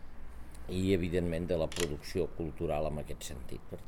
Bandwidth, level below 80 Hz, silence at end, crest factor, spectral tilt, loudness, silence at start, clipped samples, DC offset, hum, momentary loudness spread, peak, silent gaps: 18 kHz; -46 dBFS; 0 s; 20 dB; -5.5 dB/octave; -35 LUFS; 0 s; under 0.1%; 0.3%; none; 17 LU; -16 dBFS; none